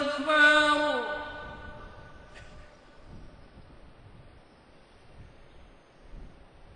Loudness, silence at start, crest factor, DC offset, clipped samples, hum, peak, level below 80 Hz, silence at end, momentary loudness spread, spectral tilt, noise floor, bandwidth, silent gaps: -24 LUFS; 0 s; 22 dB; under 0.1%; under 0.1%; none; -10 dBFS; -54 dBFS; 0.45 s; 30 LU; -3 dB/octave; -56 dBFS; 10.5 kHz; none